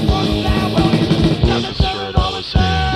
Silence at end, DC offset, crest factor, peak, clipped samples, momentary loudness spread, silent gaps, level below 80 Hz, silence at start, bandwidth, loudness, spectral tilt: 0 s; under 0.1%; 16 dB; 0 dBFS; under 0.1%; 4 LU; none; -22 dBFS; 0 s; 13.5 kHz; -16 LUFS; -6.5 dB/octave